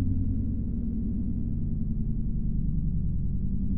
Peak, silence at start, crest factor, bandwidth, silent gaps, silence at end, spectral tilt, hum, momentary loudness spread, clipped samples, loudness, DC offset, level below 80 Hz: -16 dBFS; 0 s; 10 dB; 1.1 kHz; none; 0 s; -16 dB/octave; none; 2 LU; under 0.1%; -31 LUFS; 1%; -30 dBFS